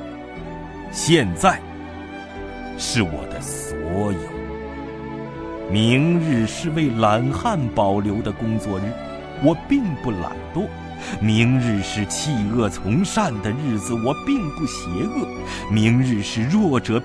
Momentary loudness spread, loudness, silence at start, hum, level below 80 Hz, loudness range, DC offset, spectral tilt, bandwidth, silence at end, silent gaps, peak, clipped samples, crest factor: 14 LU; -21 LUFS; 0 s; none; -42 dBFS; 5 LU; under 0.1%; -5.5 dB/octave; 11 kHz; 0 s; none; -2 dBFS; under 0.1%; 20 dB